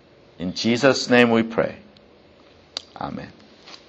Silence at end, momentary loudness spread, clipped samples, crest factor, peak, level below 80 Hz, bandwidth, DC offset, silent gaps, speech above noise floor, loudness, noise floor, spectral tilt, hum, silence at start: 0.15 s; 19 LU; under 0.1%; 22 dB; 0 dBFS; -58 dBFS; 8.4 kHz; under 0.1%; none; 31 dB; -20 LUFS; -51 dBFS; -4.5 dB/octave; none; 0.4 s